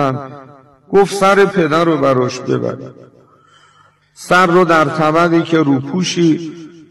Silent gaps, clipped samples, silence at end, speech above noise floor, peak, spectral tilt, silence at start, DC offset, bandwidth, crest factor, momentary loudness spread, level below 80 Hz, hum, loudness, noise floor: none; under 0.1%; 0.2 s; 37 dB; -4 dBFS; -5.5 dB/octave; 0 s; under 0.1%; 13 kHz; 12 dB; 15 LU; -52 dBFS; none; -13 LUFS; -51 dBFS